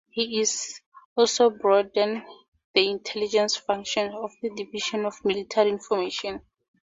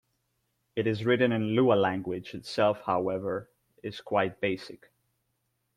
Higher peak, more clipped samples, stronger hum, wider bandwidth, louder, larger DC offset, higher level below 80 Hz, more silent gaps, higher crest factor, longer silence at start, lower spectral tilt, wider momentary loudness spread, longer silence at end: first, -4 dBFS vs -10 dBFS; neither; neither; second, 7.8 kHz vs 12 kHz; first, -25 LUFS vs -28 LUFS; neither; about the same, -66 dBFS vs -68 dBFS; first, 0.86-0.92 s, 1.05-1.16 s, 2.48-2.52 s, 2.64-2.74 s vs none; about the same, 22 dB vs 20 dB; second, 0.15 s vs 0.75 s; second, -2 dB/octave vs -7 dB/octave; second, 11 LU vs 14 LU; second, 0.4 s vs 1 s